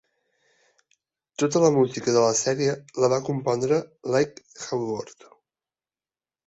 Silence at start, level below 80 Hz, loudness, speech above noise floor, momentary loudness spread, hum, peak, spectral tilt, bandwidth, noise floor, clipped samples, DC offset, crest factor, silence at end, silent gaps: 1.4 s; -66 dBFS; -24 LUFS; over 67 dB; 11 LU; none; -6 dBFS; -5 dB/octave; 8.2 kHz; under -90 dBFS; under 0.1%; under 0.1%; 18 dB; 1.35 s; none